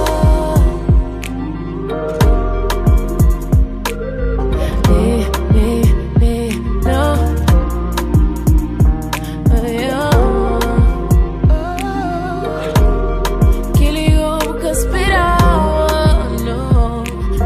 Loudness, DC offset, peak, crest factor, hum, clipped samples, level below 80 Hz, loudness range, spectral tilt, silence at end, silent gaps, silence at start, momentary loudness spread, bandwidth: -15 LUFS; under 0.1%; 0 dBFS; 12 dB; none; under 0.1%; -16 dBFS; 2 LU; -6.5 dB/octave; 0 s; none; 0 s; 7 LU; 15.5 kHz